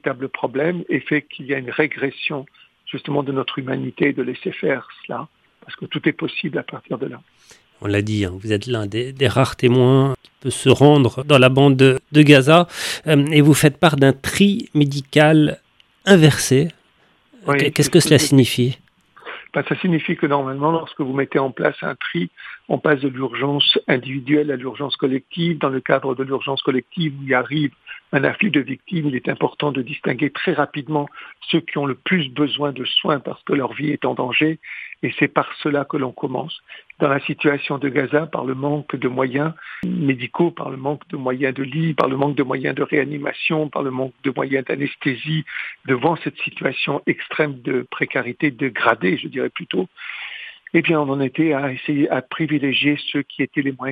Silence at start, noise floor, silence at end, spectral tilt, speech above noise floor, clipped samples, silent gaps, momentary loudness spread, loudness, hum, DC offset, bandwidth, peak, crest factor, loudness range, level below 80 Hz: 0.05 s; -58 dBFS; 0 s; -5.5 dB/octave; 39 dB; under 0.1%; none; 12 LU; -19 LUFS; none; under 0.1%; 15.5 kHz; 0 dBFS; 20 dB; 9 LU; -56 dBFS